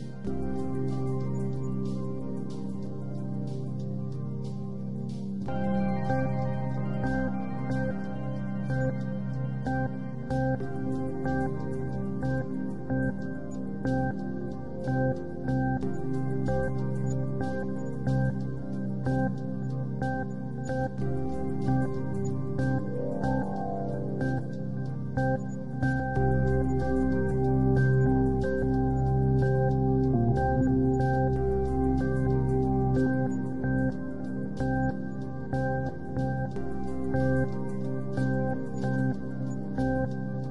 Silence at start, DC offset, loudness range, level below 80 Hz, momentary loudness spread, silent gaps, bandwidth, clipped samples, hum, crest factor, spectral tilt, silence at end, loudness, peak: 0 s; 1%; 6 LU; -42 dBFS; 9 LU; none; 7.4 kHz; under 0.1%; none; 14 dB; -9.5 dB/octave; 0 s; -30 LUFS; -14 dBFS